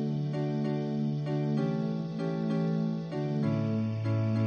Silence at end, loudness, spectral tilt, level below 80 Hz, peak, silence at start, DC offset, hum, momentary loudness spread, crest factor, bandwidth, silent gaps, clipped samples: 0 s; -31 LUFS; -9.5 dB/octave; -70 dBFS; -18 dBFS; 0 s; under 0.1%; none; 3 LU; 12 dB; 6.8 kHz; none; under 0.1%